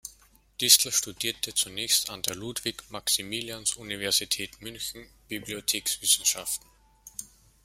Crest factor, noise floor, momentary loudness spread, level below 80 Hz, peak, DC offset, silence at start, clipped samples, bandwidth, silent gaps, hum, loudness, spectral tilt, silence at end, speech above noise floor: 28 dB; -59 dBFS; 19 LU; -60 dBFS; -2 dBFS; under 0.1%; 0.05 s; under 0.1%; 16.5 kHz; none; none; -26 LUFS; 0 dB/octave; 0.4 s; 30 dB